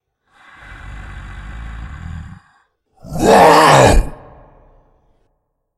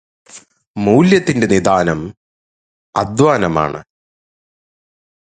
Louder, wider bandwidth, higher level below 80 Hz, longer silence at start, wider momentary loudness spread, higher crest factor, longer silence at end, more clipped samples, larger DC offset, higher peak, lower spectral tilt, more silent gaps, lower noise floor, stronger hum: first, -9 LUFS vs -14 LUFS; first, 14.5 kHz vs 9.4 kHz; first, -26 dBFS vs -44 dBFS; first, 0.85 s vs 0.35 s; first, 26 LU vs 14 LU; about the same, 16 dB vs 16 dB; first, 1.65 s vs 1.4 s; neither; neither; about the same, 0 dBFS vs 0 dBFS; second, -4.5 dB/octave vs -6 dB/octave; second, none vs 0.67-0.74 s, 2.17-2.93 s; first, -68 dBFS vs -43 dBFS; neither